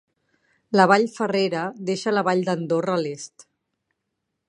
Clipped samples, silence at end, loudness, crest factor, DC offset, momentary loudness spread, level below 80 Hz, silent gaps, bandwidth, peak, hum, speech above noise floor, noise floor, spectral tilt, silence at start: under 0.1%; 1.25 s; -22 LUFS; 22 dB; under 0.1%; 11 LU; -74 dBFS; none; 11 kHz; -2 dBFS; none; 58 dB; -79 dBFS; -5.5 dB/octave; 0.7 s